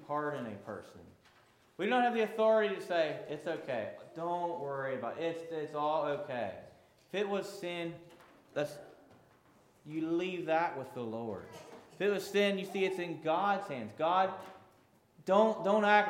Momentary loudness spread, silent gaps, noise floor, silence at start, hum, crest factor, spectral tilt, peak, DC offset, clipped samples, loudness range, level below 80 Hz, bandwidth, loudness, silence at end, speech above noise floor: 16 LU; none; -66 dBFS; 0 s; none; 22 dB; -5.5 dB/octave; -12 dBFS; under 0.1%; under 0.1%; 7 LU; -80 dBFS; 16.5 kHz; -34 LUFS; 0 s; 33 dB